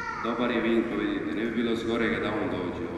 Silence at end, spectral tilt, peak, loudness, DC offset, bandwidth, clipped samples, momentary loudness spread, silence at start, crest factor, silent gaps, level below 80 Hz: 0 s; -6.5 dB/octave; -14 dBFS; -28 LUFS; under 0.1%; 12 kHz; under 0.1%; 4 LU; 0 s; 14 dB; none; -52 dBFS